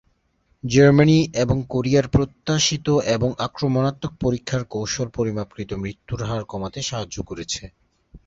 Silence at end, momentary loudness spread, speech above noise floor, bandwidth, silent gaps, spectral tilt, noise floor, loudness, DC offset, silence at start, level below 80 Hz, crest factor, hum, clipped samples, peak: 0.1 s; 14 LU; 44 dB; 7.8 kHz; none; -5.5 dB/octave; -65 dBFS; -21 LUFS; under 0.1%; 0.65 s; -42 dBFS; 18 dB; none; under 0.1%; -4 dBFS